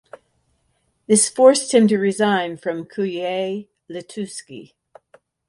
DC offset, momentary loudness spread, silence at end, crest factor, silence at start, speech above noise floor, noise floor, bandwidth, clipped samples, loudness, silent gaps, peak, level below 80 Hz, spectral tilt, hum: under 0.1%; 21 LU; 0.85 s; 20 dB; 1.1 s; 49 dB; -67 dBFS; 11.5 kHz; under 0.1%; -18 LUFS; none; 0 dBFS; -68 dBFS; -4 dB/octave; none